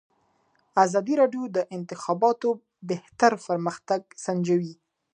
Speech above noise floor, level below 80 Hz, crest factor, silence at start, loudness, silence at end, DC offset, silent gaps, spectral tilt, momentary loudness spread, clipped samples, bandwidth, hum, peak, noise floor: 43 dB; -76 dBFS; 22 dB; 0.75 s; -25 LUFS; 0.4 s; under 0.1%; none; -6 dB/octave; 11 LU; under 0.1%; 10 kHz; none; -4 dBFS; -68 dBFS